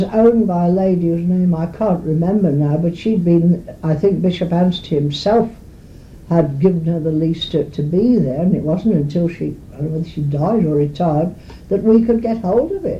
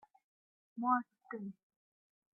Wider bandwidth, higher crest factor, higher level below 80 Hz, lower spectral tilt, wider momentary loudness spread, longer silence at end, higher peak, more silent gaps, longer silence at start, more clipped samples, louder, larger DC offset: first, 7.4 kHz vs 2.3 kHz; second, 14 dB vs 24 dB; first, -40 dBFS vs under -90 dBFS; first, -9 dB/octave vs -1 dB/octave; second, 7 LU vs 15 LU; second, 0 s vs 0.8 s; first, -2 dBFS vs -18 dBFS; neither; second, 0 s vs 0.75 s; neither; first, -17 LUFS vs -38 LUFS; neither